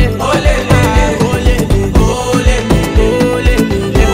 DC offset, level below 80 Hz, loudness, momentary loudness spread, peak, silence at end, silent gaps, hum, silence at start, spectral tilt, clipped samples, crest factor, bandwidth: under 0.1%; -14 dBFS; -11 LUFS; 2 LU; 0 dBFS; 0 s; none; none; 0 s; -6 dB/octave; under 0.1%; 10 dB; 16 kHz